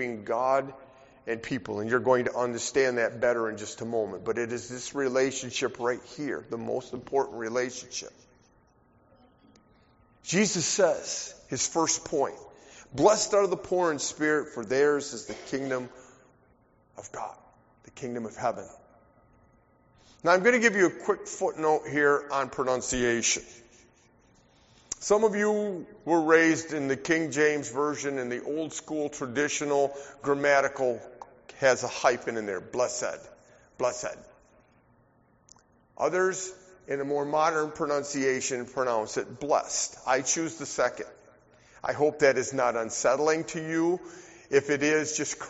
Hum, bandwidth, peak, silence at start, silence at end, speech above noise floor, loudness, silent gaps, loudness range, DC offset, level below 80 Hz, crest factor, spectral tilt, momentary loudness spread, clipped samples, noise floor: none; 8 kHz; -6 dBFS; 0 s; 0 s; 36 dB; -28 LUFS; none; 9 LU; under 0.1%; -62 dBFS; 22 dB; -3 dB/octave; 13 LU; under 0.1%; -64 dBFS